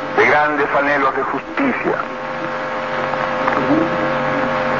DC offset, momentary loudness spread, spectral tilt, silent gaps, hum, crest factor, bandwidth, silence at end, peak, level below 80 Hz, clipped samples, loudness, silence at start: 0.5%; 8 LU; -6 dB/octave; none; none; 16 dB; 7.4 kHz; 0 s; -2 dBFS; -50 dBFS; under 0.1%; -17 LUFS; 0 s